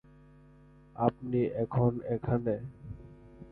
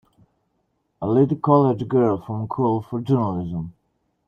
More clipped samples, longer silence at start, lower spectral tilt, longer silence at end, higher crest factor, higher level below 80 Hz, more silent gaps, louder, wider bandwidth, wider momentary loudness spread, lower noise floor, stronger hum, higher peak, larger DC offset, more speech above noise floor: neither; about the same, 0.95 s vs 1 s; about the same, -12 dB/octave vs -11 dB/octave; second, 0 s vs 0.55 s; about the same, 22 dB vs 18 dB; about the same, -56 dBFS vs -56 dBFS; neither; second, -31 LUFS vs -21 LUFS; second, 4.1 kHz vs 6 kHz; first, 21 LU vs 13 LU; second, -57 dBFS vs -71 dBFS; neither; second, -10 dBFS vs -4 dBFS; neither; second, 27 dB vs 51 dB